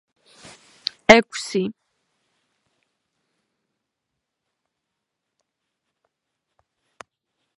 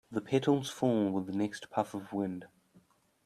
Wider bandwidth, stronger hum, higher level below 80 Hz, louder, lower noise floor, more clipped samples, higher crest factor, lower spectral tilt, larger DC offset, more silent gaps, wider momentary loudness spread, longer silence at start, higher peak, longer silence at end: second, 11.5 kHz vs 14 kHz; neither; first, -58 dBFS vs -74 dBFS; first, -18 LUFS vs -33 LUFS; first, -81 dBFS vs -66 dBFS; neither; first, 26 dB vs 18 dB; second, -3.5 dB/octave vs -6.5 dB/octave; neither; neither; first, 17 LU vs 7 LU; first, 1.1 s vs 0.1 s; first, 0 dBFS vs -14 dBFS; first, 5.9 s vs 0.8 s